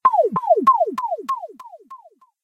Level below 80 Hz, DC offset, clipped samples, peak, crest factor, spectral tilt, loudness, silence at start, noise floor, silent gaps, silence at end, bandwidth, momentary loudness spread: -68 dBFS; under 0.1%; under 0.1%; -4 dBFS; 16 dB; -7 dB/octave; -19 LUFS; 0.05 s; -47 dBFS; none; 0.45 s; 15 kHz; 17 LU